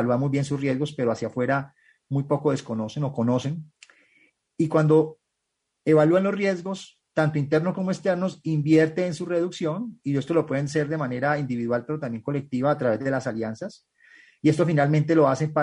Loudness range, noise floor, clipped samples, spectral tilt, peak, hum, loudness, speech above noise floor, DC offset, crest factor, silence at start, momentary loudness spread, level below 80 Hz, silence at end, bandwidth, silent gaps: 4 LU; -80 dBFS; under 0.1%; -7.5 dB/octave; -6 dBFS; none; -24 LUFS; 56 dB; under 0.1%; 18 dB; 0 s; 11 LU; -64 dBFS; 0 s; 10.5 kHz; none